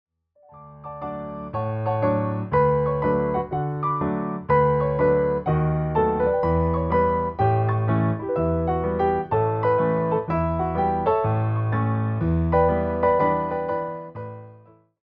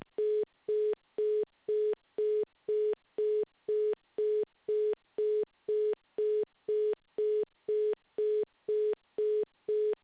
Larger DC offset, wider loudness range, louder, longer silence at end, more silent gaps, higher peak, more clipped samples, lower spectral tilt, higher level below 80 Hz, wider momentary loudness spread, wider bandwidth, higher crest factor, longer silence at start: neither; about the same, 2 LU vs 0 LU; first, -23 LUFS vs -33 LUFS; first, 0.45 s vs 0.1 s; neither; first, -6 dBFS vs -26 dBFS; neither; first, -11.5 dB/octave vs -4.5 dB/octave; first, -42 dBFS vs -82 dBFS; first, 9 LU vs 2 LU; first, 5 kHz vs 4 kHz; first, 16 dB vs 8 dB; first, 0.55 s vs 0.2 s